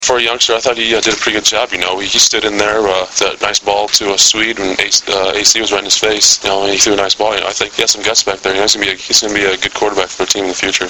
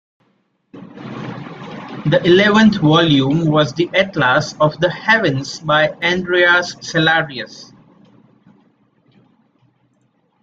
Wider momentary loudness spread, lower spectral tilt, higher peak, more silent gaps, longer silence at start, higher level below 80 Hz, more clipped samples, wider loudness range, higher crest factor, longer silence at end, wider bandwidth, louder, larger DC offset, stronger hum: second, 6 LU vs 19 LU; second, -0.5 dB/octave vs -5.5 dB/octave; about the same, 0 dBFS vs 0 dBFS; neither; second, 0 s vs 0.75 s; first, -44 dBFS vs -52 dBFS; first, 0.2% vs under 0.1%; second, 2 LU vs 6 LU; about the same, 14 dB vs 16 dB; second, 0 s vs 2.8 s; first, over 20 kHz vs 7.8 kHz; first, -11 LUFS vs -14 LUFS; neither; neither